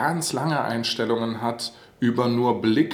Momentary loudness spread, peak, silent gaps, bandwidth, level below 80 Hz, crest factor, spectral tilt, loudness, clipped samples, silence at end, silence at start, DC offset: 6 LU; -8 dBFS; none; 19.5 kHz; -66 dBFS; 16 dB; -5 dB/octave; -24 LUFS; under 0.1%; 0 s; 0 s; under 0.1%